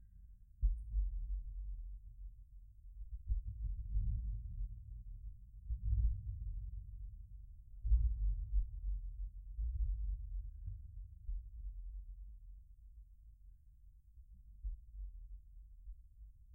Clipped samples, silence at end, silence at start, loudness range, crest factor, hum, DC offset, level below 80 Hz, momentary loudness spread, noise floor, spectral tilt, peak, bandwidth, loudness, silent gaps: under 0.1%; 0 s; 0 s; 15 LU; 20 dB; none; under 0.1%; -42 dBFS; 22 LU; -62 dBFS; -10 dB/octave; -22 dBFS; 0.2 kHz; -45 LUFS; none